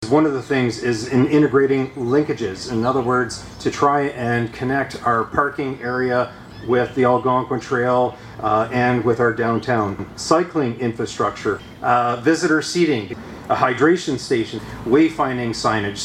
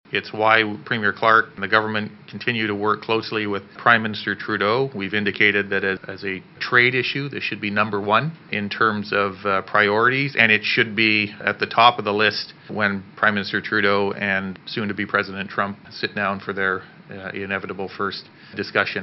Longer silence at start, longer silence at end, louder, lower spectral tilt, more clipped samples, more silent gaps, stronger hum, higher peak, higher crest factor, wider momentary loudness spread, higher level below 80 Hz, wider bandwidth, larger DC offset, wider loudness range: about the same, 0 s vs 0.1 s; about the same, 0 s vs 0 s; about the same, -19 LUFS vs -20 LUFS; first, -5.5 dB/octave vs -2 dB/octave; neither; neither; neither; about the same, -2 dBFS vs 0 dBFS; second, 16 dB vs 22 dB; second, 8 LU vs 12 LU; first, -50 dBFS vs -70 dBFS; first, 13 kHz vs 6 kHz; neither; second, 2 LU vs 7 LU